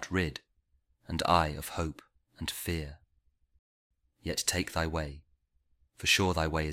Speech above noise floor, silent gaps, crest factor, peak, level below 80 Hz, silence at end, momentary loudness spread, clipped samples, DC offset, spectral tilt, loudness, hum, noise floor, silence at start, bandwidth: 41 dB; 3.59-3.90 s; 24 dB; -10 dBFS; -48 dBFS; 0 s; 13 LU; under 0.1%; under 0.1%; -3.5 dB/octave; -31 LUFS; none; -73 dBFS; 0 s; 16 kHz